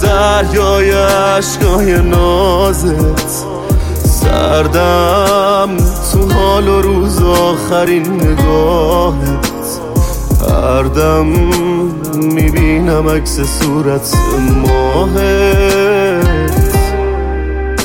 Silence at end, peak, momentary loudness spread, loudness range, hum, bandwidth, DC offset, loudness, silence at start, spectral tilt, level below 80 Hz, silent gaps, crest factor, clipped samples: 0 s; 0 dBFS; 5 LU; 2 LU; none; 17 kHz; under 0.1%; -11 LUFS; 0 s; -5.5 dB/octave; -16 dBFS; none; 10 dB; under 0.1%